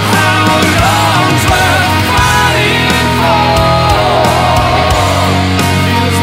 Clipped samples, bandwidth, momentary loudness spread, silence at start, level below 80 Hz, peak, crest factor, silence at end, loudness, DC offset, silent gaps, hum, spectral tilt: under 0.1%; 16.5 kHz; 2 LU; 0 s; -24 dBFS; 0 dBFS; 10 dB; 0 s; -9 LUFS; under 0.1%; none; none; -4.5 dB/octave